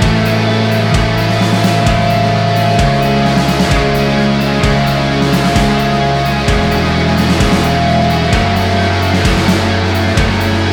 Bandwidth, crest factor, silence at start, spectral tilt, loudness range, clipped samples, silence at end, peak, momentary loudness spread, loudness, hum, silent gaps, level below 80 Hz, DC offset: over 20 kHz; 12 dB; 0 s; -5.5 dB/octave; 0 LU; under 0.1%; 0 s; 0 dBFS; 2 LU; -12 LUFS; none; none; -22 dBFS; under 0.1%